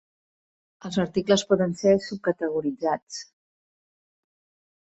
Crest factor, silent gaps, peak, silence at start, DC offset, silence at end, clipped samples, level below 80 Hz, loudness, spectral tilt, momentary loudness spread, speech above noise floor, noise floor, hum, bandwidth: 20 dB; 3.02-3.07 s; -6 dBFS; 0.85 s; under 0.1%; 1.6 s; under 0.1%; -62 dBFS; -25 LUFS; -5.5 dB/octave; 12 LU; over 66 dB; under -90 dBFS; none; 8.2 kHz